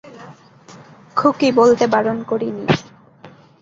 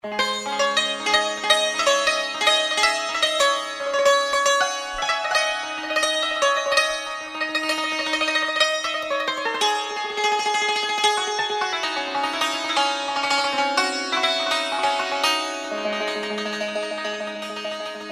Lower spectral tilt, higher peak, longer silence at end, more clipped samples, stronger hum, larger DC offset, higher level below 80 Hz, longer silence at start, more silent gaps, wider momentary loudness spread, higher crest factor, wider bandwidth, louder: first, -6 dB/octave vs 0 dB/octave; about the same, -2 dBFS vs -2 dBFS; first, 0.3 s vs 0 s; neither; neither; neither; about the same, -56 dBFS vs -58 dBFS; about the same, 0.05 s vs 0.05 s; neither; about the same, 9 LU vs 8 LU; about the same, 18 dB vs 20 dB; second, 7.6 kHz vs 15.5 kHz; first, -17 LUFS vs -21 LUFS